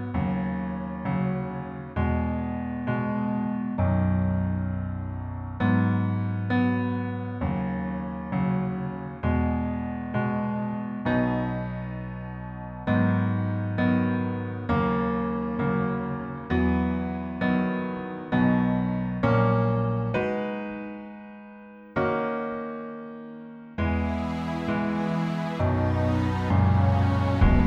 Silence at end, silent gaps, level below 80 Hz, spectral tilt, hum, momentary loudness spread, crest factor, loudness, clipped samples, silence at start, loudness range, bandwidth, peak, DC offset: 0 s; none; -38 dBFS; -9.5 dB/octave; none; 11 LU; 18 dB; -27 LUFS; under 0.1%; 0 s; 4 LU; 6.6 kHz; -8 dBFS; under 0.1%